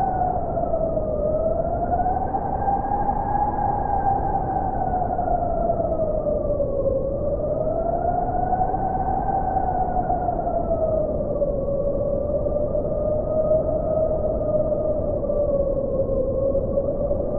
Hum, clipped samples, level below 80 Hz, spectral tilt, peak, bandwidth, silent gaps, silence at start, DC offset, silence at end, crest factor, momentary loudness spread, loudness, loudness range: none; under 0.1%; -32 dBFS; -12.5 dB/octave; -10 dBFS; 2.3 kHz; none; 0 s; under 0.1%; 0 s; 12 dB; 2 LU; -23 LUFS; 1 LU